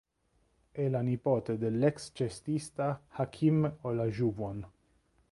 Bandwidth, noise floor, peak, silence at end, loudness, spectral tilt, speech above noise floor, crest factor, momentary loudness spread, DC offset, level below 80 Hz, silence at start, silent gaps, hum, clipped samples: 11.5 kHz; -73 dBFS; -14 dBFS; 0.6 s; -32 LUFS; -8 dB/octave; 42 dB; 18 dB; 10 LU; under 0.1%; -62 dBFS; 0.75 s; none; none; under 0.1%